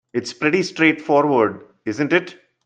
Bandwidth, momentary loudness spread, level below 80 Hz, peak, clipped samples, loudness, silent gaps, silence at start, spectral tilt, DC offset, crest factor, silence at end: 9 kHz; 13 LU; -64 dBFS; -2 dBFS; under 0.1%; -19 LUFS; none; 0.15 s; -5.5 dB/octave; under 0.1%; 18 dB; 0.35 s